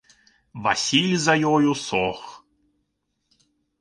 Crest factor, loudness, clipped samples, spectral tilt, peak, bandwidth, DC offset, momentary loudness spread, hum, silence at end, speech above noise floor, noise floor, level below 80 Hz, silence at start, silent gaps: 20 dB; -21 LUFS; under 0.1%; -4 dB/octave; -4 dBFS; 11 kHz; under 0.1%; 19 LU; none; 1.45 s; 54 dB; -75 dBFS; -60 dBFS; 0.55 s; none